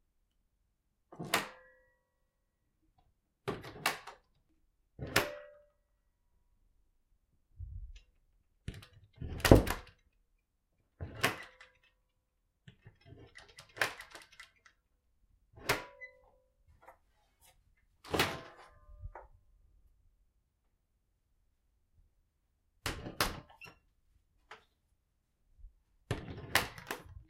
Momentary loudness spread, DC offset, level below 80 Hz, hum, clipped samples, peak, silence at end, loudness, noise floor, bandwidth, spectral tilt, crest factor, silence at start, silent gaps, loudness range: 22 LU; under 0.1%; -50 dBFS; none; under 0.1%; -2 dBFS; 0.05 s; -35 LUFS; -80 dBFS; 16 kHz; -4.5 dB/octave; 38 dB; 1.1 s; none; 11 LU